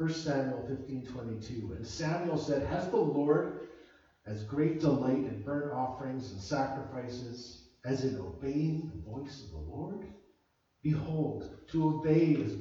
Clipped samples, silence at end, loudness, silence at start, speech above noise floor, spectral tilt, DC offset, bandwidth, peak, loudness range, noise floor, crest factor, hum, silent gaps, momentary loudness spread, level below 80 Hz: under 0.1%; 0 s; -34 LUFS; 0 s; 41 dB; -7.5 dB/octave; under 0.1%; 7.6 kHz; -14 dBFS; 6 LU; -74 dBFS; 18 dB; none; none; 15 LU; -56 dBFS